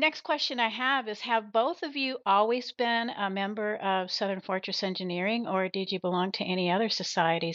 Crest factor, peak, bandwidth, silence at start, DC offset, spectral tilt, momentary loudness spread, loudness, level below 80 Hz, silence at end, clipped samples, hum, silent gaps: 18 dB; -10 dBFS; 7.6 kHz; 0 s; under 0.1%; -2 dB/octave; 5 LU; -29 LUFS; -90 dBFS; 0 s; under 0.1%; none; none